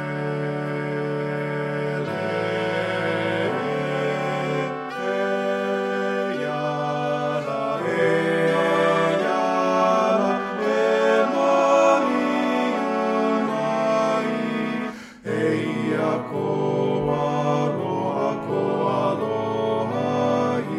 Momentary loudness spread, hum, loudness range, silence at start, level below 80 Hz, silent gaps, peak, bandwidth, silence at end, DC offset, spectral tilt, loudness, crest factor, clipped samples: 7 LU; none; 5 LU; 0 s; -62 dBFS; none; -6 dBFS; 13 kHz; 0 s; under 0.1%; -6 dB/octave; -23 LUFS; 16 dB; under 0.1%